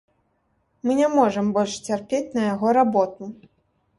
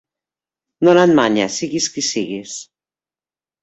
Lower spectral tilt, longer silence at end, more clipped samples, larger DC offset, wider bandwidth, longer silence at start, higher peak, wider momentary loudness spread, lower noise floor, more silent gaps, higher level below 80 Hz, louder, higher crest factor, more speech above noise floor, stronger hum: first, -5.5 dB/octave vs -4 dB/octave; second, 0.65 s vs 1 s; neither; neither; first, 11.5 kHz vs 8.2 kHz; about the same, 0.85 s vs 0.8 s; second, -6 dBFS vs -2 dBFS; second, 10 LU vs 16 LU; second, -69 dBFS vs under -90 dBFS; neither; about the same, -62 dBFS vs -60 dBFS; second, -22 LUFS vs -16 LUFS; about the same, 16 dB vs 18 dB; second, 47 dB vs over 74 dB; neither